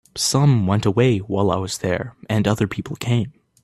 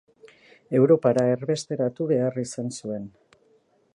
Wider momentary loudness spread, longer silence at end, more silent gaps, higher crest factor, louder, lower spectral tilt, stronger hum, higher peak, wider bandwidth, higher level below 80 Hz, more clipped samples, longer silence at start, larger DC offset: second, 8 LU vs 14 LU; second, 0.35 s vs 0.85 s; neither; about the same, 18 dB vs 18 dB; first, -20 LUFS vs -24 LUFS; about the same, -5.5 dB/octave vs -6.5 dB/octave; neither; first, -2 dBFS vs -6 dBFS; first, 13.5 kHz vs 11 kHz; first, -50 dBFS vs -68 dBFS; neither; second, 0.15 s vs 0.7 s; neither